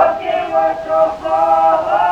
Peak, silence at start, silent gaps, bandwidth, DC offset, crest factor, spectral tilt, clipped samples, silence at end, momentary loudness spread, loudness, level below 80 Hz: -2 dBFS; 0 s; none; 8.2 kHz; under 0.1%; 12 dB; -5 dB/octave; under 0.1%; 0 s; 4 LU; -15 LUFS; -48 dBFS